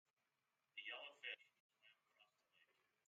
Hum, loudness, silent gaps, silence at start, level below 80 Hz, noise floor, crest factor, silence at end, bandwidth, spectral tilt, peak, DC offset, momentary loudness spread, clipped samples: none; -54 LUFS; 1.60-1.69 s; 0.75 s; under -90 dBFS; under -90 dBFS; 24 dB; 0.45 s; 7.4 kHz; 4.5 dB/octave; -38 dBFS; under 0.1%; 5 LU; under 0.1%